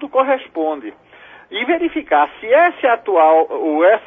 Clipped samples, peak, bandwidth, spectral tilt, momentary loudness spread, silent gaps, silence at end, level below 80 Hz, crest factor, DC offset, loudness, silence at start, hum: under 0.1%; -2 dBFS; 3.8 kHz; -6 dB/octave; 10 LU; none; 0.05 s; -58 dBFS; 14 dB; under 0.1%; -15 LUFS; 0 s; none